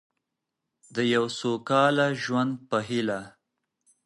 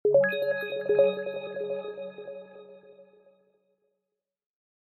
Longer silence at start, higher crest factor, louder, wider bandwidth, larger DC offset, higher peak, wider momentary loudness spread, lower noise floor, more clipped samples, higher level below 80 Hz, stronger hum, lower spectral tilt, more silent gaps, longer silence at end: first, 0.9 s vs 0.05 s; about the same, 20 dB vs 20 dB; about the same, -26 LUFS vs -28 LUFS; about the same, 11.5 kHz vs 12.5 kHz; neither; about the same, -8 dBFS vs -10 dBFS; second, 8 LU vs 20 LU; about the same, -84 dBFS vs -86 dBFS; neither; first, -72 dBFS vs -78 dBFS; neither; second, -5 dB/octave vs -8 dB/octave; neither; second, 0.75 s vs 1.95 s